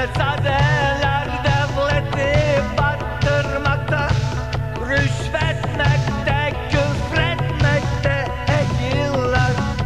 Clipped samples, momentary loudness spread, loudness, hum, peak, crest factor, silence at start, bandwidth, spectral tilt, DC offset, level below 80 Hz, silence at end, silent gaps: under 0.1%; 3 LU; -19 LUFS; none; -4 dBFS; 16 dB; 0 s; 11 kHz; -6 dB/octave; 1%; -30 dBFS; 0 s; none